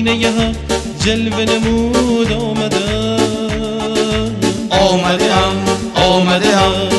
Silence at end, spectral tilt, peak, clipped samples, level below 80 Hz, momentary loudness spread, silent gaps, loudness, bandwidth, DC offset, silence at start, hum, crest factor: 0 s; -4.5 dB/octave; -2 dBFS; under 0.1%; -30 dBFS; 6 LU; none; -14 LUFS; 12 kHz; under 0.1%; 0 s; none; 12 dB